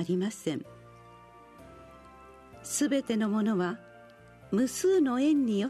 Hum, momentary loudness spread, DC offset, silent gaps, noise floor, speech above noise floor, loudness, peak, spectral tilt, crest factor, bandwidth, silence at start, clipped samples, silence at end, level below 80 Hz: none; 19 LU; under 0.1%; none; -53 dBFS; 25 dB; -29 LUFS; -16 dBFS; -5 dB/octave; 14 dB; 13.5 kHz; 0 s; under 0.1%; 0 s; -66 dBFS